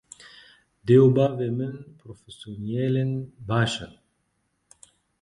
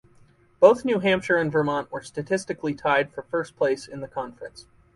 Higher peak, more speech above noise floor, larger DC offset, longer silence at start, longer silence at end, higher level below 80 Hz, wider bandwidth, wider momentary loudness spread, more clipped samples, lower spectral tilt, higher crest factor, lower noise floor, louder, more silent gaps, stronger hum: second, -6 dBFS vs -2 dBFS; first, 50 dB vs 33 dB; neither; first, 0.85 s vs 0.6 s; first, 1.35 s vs 0.35 s; about the same, -58 dBFS vs -60 dBFS; about the same, 11.5 kHz vs 11.5 kHz; first, 27 LU vs 15 LU; neither; first, -7 dB/octave vs -5.5 dB/octave; about the same, 20 dB vs 22 dB; first, -73 dBFS vs -57 dBFS; about the same, -23 LUFS vs -24 LUFS; neither; neither